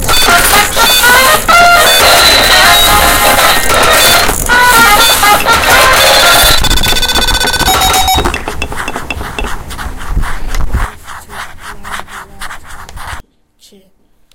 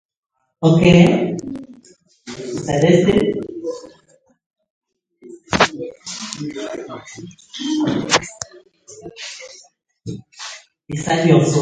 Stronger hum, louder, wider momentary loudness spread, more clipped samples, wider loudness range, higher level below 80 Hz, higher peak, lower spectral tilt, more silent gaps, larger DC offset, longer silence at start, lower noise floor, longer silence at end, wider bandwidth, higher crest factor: neither; first, -5 LUFS vs -17 LUFS; about the same, 21 LU vs 21 LU; first, 2% vs under 0.1%; first, 18 LU vs 8 LU; first, -20 dBFS vs -46 dBFS; about the same, 0 dBFS vs 0 dBFS; second, -1.5 dB/octave vs -5.5 dB/octave; second, none vs 4.46-4.50 s, 4.70-4.81 s; neither; second, 0 s vs 0.6 s; second, -47 dBFS vs -56 dBFS; first, 1.15 s vs 0 s; first, over 20 kHz vs 9.4 kHz; second, 8 dB vs 20 dB